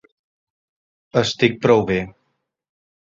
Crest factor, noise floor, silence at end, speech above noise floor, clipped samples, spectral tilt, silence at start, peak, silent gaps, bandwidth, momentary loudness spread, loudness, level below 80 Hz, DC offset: 20 dB; -72 dBFS; 0.95 s; 55 dB; under 0.1%; -5.5 dB/octave; 1.15 s; -2 dBFS; none; 7.8 kHz; 8 LU; -18 LUFS; -52 dBFS; under 0.1%